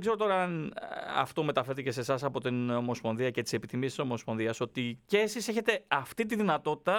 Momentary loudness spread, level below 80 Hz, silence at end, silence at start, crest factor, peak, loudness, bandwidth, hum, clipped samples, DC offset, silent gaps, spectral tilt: 5 LU; -70 dBFS; 0 s; 0 s; 22 dB; -10 dBFS; -32 LUFS; 18.5 kHz; none; under 0.1%; under 0.1%; none; -5 dB/octave